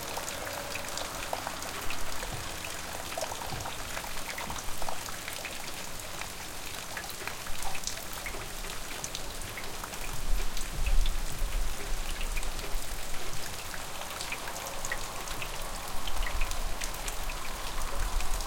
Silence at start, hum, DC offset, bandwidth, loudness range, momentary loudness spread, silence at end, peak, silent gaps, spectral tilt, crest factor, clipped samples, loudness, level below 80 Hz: 0 s; none; under 0.1%; 17 kHz; 1 LU; 3 LU; 0 s; -12 dBFS; none; -2 dB/octave; 20 dB; under 0.1%; -36 LUFS; -36 dBFS